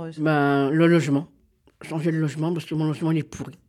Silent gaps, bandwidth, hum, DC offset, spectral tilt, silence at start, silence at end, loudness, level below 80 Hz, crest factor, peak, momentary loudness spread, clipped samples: none; 12.5 kHz; none; under 0.1%; -7.5 dB/octave; 0 s; 0.15 s; -23 LUFS; -64 dBFS; 14 dB; -8 dBFS; 9 LU; under 0.1%